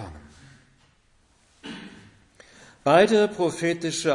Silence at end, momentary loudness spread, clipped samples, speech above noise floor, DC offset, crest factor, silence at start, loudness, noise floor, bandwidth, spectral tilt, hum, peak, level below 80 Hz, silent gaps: 0 s; 24 LU; under 0.1%; 41 dB; under 0.1%; 22 dB; 0 s; -21 LUFS; -62 dBFS; 11 kHz; -4.5 dB/octave; none; -4 dBFS; -60 dBFS; none